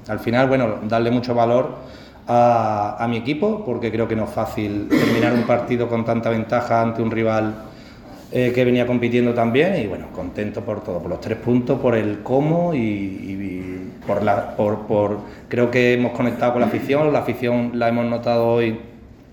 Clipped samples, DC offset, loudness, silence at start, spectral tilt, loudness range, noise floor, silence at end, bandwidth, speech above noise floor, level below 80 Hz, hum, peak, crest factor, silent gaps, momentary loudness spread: under 0.1%; under 0.1%; -20 LUFS; 0 s; -7.5 dB/octave; 2 LU; -40 dBFS; 0.3 s; 18.5 kHz; 20 dB; -48 dBFS; none; -2 dBFS; 18 dB; none; 11 LU